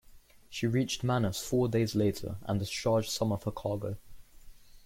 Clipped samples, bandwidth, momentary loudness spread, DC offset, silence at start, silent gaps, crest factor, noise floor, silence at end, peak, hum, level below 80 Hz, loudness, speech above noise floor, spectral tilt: under 0.1%; 16.5 kHz; 9 LU; under 0.1%; 0.1 s; none; 14 dB; -55 dBFS; 0 s; -16 dBFS; none; -54 dBFS; -31 LUFS; 25 dB; -5.5 dB/octave